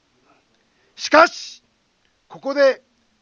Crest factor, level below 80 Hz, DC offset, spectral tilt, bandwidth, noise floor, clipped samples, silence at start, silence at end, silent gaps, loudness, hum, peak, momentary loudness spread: 22 dB; -66 dBFS; under 0.1%; -2 dB/octave; 7.4 kHz; -64 dBFS; under 0.1%; 1 s; 0.45 s; none; -17 LUFS; none; 0 dBFS; 19 LU